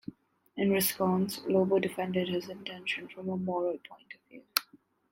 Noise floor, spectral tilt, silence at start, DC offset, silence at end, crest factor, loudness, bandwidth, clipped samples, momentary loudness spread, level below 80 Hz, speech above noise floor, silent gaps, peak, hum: -62 dBFS; -4.5 dB/octave; 0.1 s; under 0.1%; 0.35 s; 30 dB; -31 LUFS; 16 kHz; under 0.1%; 20 LU; -74 dBFS; 31 dB; none; -2 dBFS; none